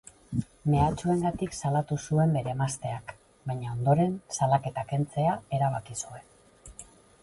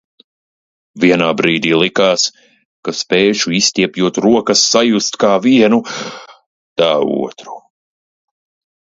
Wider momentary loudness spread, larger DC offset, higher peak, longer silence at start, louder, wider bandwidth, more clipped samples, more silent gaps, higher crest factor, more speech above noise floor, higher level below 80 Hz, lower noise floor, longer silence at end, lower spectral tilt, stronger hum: about the same, 16 LU vs 14 LU; neither; second, -10 dBFS vs 0 dBFS; second, 0.3 s vs 0.95 s; second, -29 LUFS vs -13 LUFS; first, 11.5 kHz vs 7.8 kHz; neither; second, none vs 2.65-2.83 s, 6.46-6.76 s; about the same, 18 dB vs 14 dB; second, 24 dB vs over 77 dB; first, -50 dBFS vs -58 dBFS; second, -52 dBFS vs under -90 dBFS; second, 0.4 s vs 1.25 s; first, -6.5 dB/octave vs -3.5 dB/octave; neither